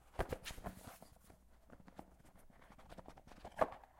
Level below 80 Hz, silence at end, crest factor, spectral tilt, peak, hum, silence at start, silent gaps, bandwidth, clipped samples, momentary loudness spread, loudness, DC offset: -58 dBFS; 0 s; 30 dB; -5 dB/octave; -18 dBFS; none; 0 s; none; 16.5 kHz; under 0.1%; 25 LU; -47 LUFS; under 0.1%